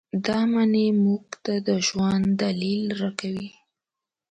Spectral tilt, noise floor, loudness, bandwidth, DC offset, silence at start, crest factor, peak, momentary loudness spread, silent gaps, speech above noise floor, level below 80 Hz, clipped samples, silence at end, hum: -5.5 dB/octave; -88 dBFS; -24 LUFS; 9 kHz; under 0.1%; 0.15 s; 18 dB; -6 dBFS; 9 LU; none; 65 dB; -58 dBFS; under 0.1%; 0.85 s; none